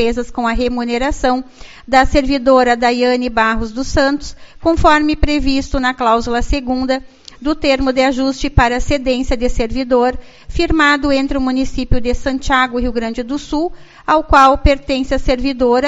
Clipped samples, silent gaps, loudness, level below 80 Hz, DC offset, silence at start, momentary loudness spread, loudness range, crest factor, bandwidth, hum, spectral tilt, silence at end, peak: under 0.1%; none; -15 LUFS; -24 dBFS; under 0.1%; 0 s; 9 LU; 2 LU; 14 dB; 8 kHz; none; -3.5 dB/octave; 0 s; 0 dBFS